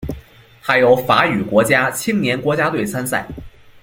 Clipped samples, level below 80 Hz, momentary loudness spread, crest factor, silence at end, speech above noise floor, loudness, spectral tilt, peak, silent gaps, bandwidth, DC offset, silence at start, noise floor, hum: under 0.1%; -44 dBFS; 17 LU; 18 dB; 0.35 s; 26 dB; -16 LUFS; -4.5 dB/octave; 0 dBFS; none; 17 kHz; under 0.1%; 0 s; -42 dBFS; none